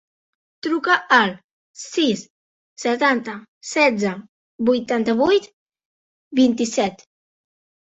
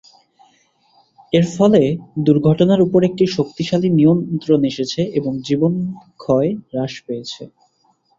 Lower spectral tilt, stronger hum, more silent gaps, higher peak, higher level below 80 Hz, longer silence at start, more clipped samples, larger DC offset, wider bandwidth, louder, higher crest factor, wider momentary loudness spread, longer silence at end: second, -4 dB/octave vs -7.5 dB/octave; neither; first, 1.44-1.74 s, 2.30-2.76 s, 3.48-3.61 s, 4.29-4.59 s, 5.53-5.66 s, 5.85-6.31 s vs none; about the same, -2 dBFS vs -2 dBFS; second, -64 dBFS vs -54 dBFS; second, 0.65 s vs 1.3 s; neither; neither; about the same, 8.2 kHz vs 7.8 kHz; second, -20 LUFS vs -17 LUFS; about the same, 20 dB vs 16 dB; about the same, 12 LU vs 13 LU; first, 1 s vs 0.75 s